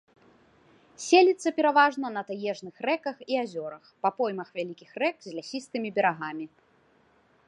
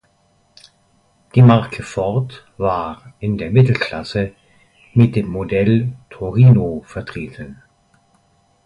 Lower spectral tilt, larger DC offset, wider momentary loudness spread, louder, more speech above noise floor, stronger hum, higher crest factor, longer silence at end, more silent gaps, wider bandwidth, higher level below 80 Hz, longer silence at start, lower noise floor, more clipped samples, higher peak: second, -4 dB/octave vs -8.5 dB/octave; neither; about the same, 16 LU vs 18 LU; second, -27 LUFS vs -17 LUFS; second, 37 dB vs 43 dB; neither; about the same, 22 dB vs 18 dB; about the same, 1 s vs 1.1 s; neither; first, 11 kHz vs 8.6 kHz; second, -80 dBFS vs -44 dBFS; second, 1 s vs 1.35 s; first, -64 dBFS vs -59 dBFS; neither; second, -6 dBFS vs 0 dBFS